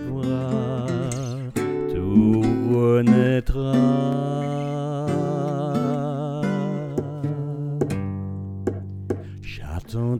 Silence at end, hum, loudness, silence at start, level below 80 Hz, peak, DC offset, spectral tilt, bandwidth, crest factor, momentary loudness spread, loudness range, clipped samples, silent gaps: 0 s; none; -23 LUFS; 0 s; -40 dBFS; -4 dBFS; under 0.1%; -8 dB/octave; 14 kHz; 18 dB; 13 LU; 8 LU; under 0.1%; none